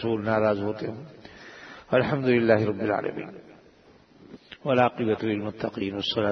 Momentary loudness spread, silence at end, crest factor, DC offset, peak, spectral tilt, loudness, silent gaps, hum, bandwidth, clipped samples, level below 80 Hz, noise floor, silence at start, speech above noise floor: 21 LU; 0 s; 20 dB; under 0.1%; -6 dBFS; -7.5 dB/octave; -25 LUFS; none; none; 6.4 kHz; under 0.1%; -62 dBFS; -55 dBFS; 0 s; 30 dB